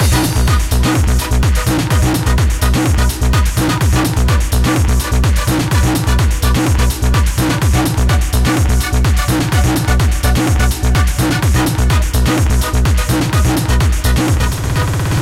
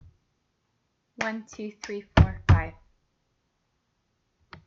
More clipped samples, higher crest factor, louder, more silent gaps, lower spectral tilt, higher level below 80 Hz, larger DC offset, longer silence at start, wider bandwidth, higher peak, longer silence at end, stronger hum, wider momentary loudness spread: neither; second, 10 dB vs 26 dB; first, -14 LUFS vs -25 LUFS; neither; second, -5 dB/octave vs -6.5 dB/octave; first, -16 dBFS vs -38 dBFS; first, 0.9% vs under 0.1%; second, 0 s vs 1.2 s; first, 16.5 kHz vs 7.2 kHz; about the same, -2 dBFS vs -2 dBFS; second, 0 s vs 1.95 s; neither; second, 1 LU vs 16 LU